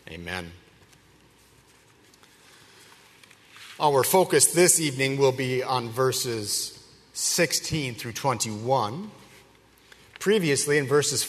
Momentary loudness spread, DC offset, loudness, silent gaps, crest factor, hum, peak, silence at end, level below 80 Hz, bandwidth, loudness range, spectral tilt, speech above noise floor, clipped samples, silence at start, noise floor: 15 LU; under 0.1%; -23 LUFS; none; 22 dB; none; -4 dBFS; 0 s; -62 dBFS; 13.5 kHz; 6 LU; -3 dB/octave; 33 dB; under 0.1%; 0.05 s; -57 dBFS